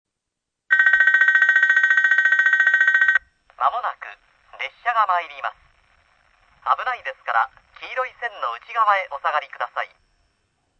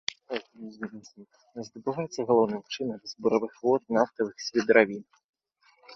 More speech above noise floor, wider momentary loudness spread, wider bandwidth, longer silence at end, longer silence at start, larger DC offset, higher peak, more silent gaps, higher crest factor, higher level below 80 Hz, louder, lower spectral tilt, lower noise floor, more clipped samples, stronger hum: first, 58 dB vs 38 dB; about the same, 17 LU vs 19 LU; about the same, 7.4 kHz vs 7.6 kHz; first, 0.95 s vs 0 s; first, 0.7 s vs 0.3 s; neither; about the same, -4 dBFS vs -4 dBFS; second, none vs 5.24-5.33 s; second, 18 dB vs 24 dB; first, -66 dBFS vs -72 dBFS; first, -18 LUFS vs -27 LUFS; second, 0.5 dB/octave vs -5 dB/octave; first, -82 dBFS vs -66 dBFS; neither; neither